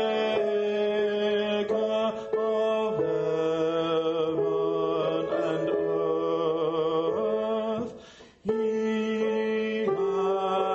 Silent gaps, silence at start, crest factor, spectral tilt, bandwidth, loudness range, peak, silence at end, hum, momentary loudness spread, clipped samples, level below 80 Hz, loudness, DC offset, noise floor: none; 0 s; 14 dB; -6.5 dB/octave; 7.8 kHz; 2 LU; -14 dBFS; 0 s; none; 2 LU; under 0.1%; -66 dBFS; -27 LUFS; under 0.1%; -49 dBFS